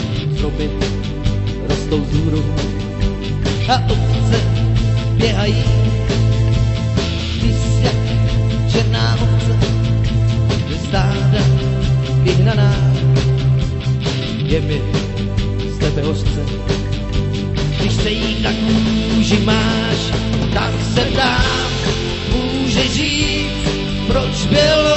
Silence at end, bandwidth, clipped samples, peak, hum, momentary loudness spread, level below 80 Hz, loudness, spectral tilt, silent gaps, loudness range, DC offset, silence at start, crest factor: 0 s; 8.4 kHz; under 0.1%; -2 dBFS; none; 6 LU; -24 dBFS; -16 LUFS; -6 dB/octave; none; 4 LU; under 0.1%; 0 s; 14 dB